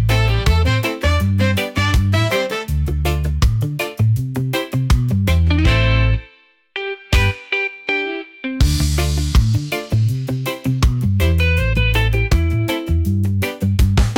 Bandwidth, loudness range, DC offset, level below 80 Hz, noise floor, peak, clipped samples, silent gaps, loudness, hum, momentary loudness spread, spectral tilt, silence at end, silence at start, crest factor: 17 kHz; 2 LU; under 0.1%; -22 dBFS; -50 dBFS; -4 dBFS; under 0.1%; none; -18 LUFS; none; 5 LU; -5.5 dB/octave; 0 s; 0 s; 12 dB